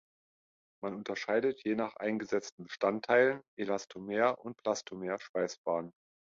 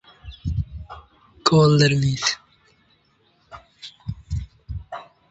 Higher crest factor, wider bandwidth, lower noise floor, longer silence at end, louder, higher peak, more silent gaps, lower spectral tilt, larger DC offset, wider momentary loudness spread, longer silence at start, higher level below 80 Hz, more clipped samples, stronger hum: about the same, 20 dB vs 24 dB; about the same, 7.6 kHz vs 8.2 kHz; first, under -90 dBFS vs -62 dBFS; first, 0.5 s vs 0.3 s; second, -34 LUFS vs -21 LUFS; second, -14 dBFS vs 0 dBFS; first, 2.52-2.58 s, 3.48-3.57 s, 5.29-5.34 s, 5.58-5.64 s vs none; about the same, -4.5 dB/octave vs -5.5 dB/octave; neither; second, 11 LU vs 24 LU; first, 0.8 s vs 0.25 s; second, -76 dBFS vs -38 dBFS; neither; neither